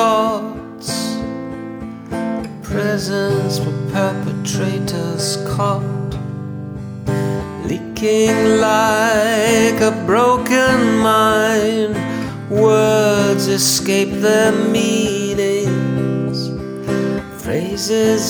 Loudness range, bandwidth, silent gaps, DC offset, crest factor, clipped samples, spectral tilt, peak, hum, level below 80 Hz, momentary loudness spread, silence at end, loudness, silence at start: 7 LU; over 20 kHz; none; under 0.1%; 14 dB; under 0.1%; -4.5 dB/octave; -2 dBFS; none; -44 dBFS; 12 LU; 0 s; -16 LUFS; 0 s